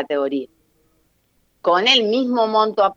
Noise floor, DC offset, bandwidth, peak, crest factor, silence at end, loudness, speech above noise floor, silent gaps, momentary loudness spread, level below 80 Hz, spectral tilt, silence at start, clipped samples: -64 dBFS; under 0.1%; 7.6 kHz; -2 dBFS; 18 dB; 0 s; -17 LUFS; 46 dB; none; 12 LU; -68 dBFS; -3.5 dB/octave; 0 s; under 0.1%